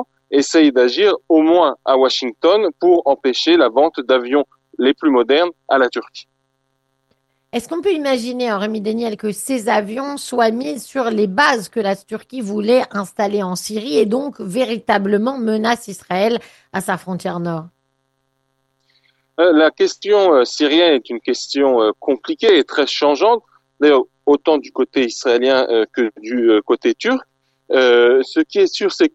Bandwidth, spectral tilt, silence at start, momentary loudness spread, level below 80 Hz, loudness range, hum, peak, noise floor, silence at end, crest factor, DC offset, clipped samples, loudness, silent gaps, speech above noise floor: 12.5 kHz; -4.5 dB/octave; 0 s; 10 LU; -62 dBFS; 7 LU; none; 0 dBFS; -68 dBFS; 0.05 s; 16 dB; under 0.1%; under 0.1%; -16 LUFS; none; 52 dB